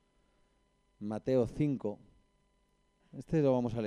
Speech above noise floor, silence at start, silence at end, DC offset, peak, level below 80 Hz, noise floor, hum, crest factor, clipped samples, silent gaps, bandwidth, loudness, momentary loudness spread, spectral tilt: 41 dB; 1 s; 0 s; under 0.1%; -18 dBFS; -60 dBFS; -73 dBFS; 50 Hz at -60 dBFS; 18 dB; under 0.1%; none; 10.5 kHz; -33 LUFS; 21 LU; -9 dB/octave